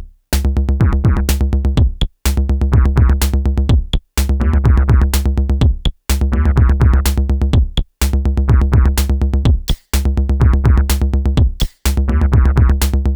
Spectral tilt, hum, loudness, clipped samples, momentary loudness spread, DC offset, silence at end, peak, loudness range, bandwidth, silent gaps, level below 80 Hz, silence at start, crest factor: -6 dB/octave; none; -15 LUFS; under 0.1%; 6 LU; under 0.1%; 0 s; -2 dBFS; 1 LU; over 20 kHz; none; -14 dBFS; 0 s; 10 dB